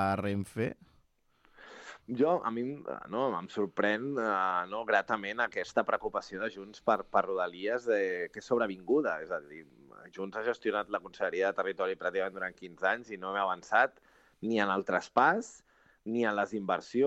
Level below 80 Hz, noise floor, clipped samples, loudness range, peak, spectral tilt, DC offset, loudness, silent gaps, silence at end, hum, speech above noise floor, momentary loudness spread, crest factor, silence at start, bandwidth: -70 dBFS; -69 dBFS; under 0.1%; 4 LU; -10 dBFS; -5.5 dB/octave; under 0.1%; -32 LUFS; none; 0 s; none; 37 dB; 11 LU; 22 dB; 0 s; 12 kHz